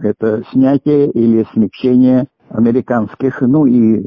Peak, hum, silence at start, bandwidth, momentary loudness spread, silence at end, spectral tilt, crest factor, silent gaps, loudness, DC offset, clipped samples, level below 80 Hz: -2 dBFS; none; 0 s; 5.4 kHz; 6 LU; 0 s; -11 dB/octave; 10 dB; none; -13 LUFS; under 0.1%; under 0.1%; -50 dBFS